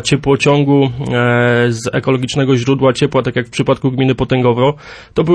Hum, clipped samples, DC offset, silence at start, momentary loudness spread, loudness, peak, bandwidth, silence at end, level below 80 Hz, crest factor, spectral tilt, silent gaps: none; under 0.1%; under 0.1%; 0 s; 5 LU; -14 LUFS; -2 dBFS; 10.5 kHz; 0 s; -42 dBFS; 12 dB; -6 dB/octave; none